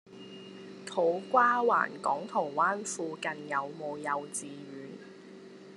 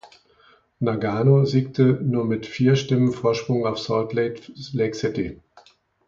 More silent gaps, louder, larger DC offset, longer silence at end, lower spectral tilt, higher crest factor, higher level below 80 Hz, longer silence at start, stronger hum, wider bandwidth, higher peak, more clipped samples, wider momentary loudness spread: neither; second, -30 LUFS vs -22 LUFS; neither; second, 0 s vs 0.75 s; second, -3.5 dB/octave vs -7.5 dB/octave; about the same, 22 dB vs 18 dB; second, -86 dBFS vs -54 dBFS; about the same, 0.1 s vs 0.05 s; neither; first, 11.5 kHz vs 7.4 kHz; second, -12 dBFS vs -4 dBFS; neither; first, 22 LU vs 9 LU